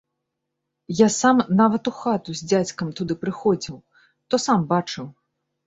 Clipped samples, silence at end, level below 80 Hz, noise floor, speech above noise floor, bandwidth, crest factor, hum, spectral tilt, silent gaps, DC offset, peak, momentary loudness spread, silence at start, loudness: under 0.1%; 0.55 s; -60 dBFS; -80 dBFS; 59 dB; 8 kHz; 20 dB; none; -5 dB/octave; none; under 0.1%; -4 dBFS; 13 LU; 0.9 s; -21 LUFS